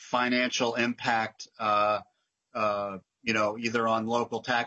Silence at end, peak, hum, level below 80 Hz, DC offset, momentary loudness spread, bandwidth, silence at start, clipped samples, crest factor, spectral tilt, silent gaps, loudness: 0 s; -12 dBFS; none; -74 dBFS; under 0.1%; 7 LU; 8 kHz; 0 s; under 0.1%; 16 dB; -3.5 dB/octave; none; -28 LUFS